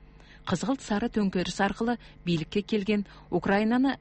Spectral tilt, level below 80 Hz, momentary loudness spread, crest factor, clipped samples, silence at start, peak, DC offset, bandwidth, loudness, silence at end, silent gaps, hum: -6 dB/octave; -52 dBFS; 7 LU; 16 dB; under 0.1%; 0 s; -12 dBFS; under 0.1%; 8.6 kHz; -28 LUFS; 0.05 s; none; none